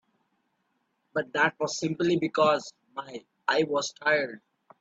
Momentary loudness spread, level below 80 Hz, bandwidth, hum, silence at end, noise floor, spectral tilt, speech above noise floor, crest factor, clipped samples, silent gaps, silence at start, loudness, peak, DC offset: 15 LU; -74 dBFS; 8 kHz; none; 0.4 s; -75 dBFS; -4 dB/octave; 48 dB; 20 dB; under 0.1%; none; 1.15 s; -27 LUFS; -10 dBFS; under 0.1%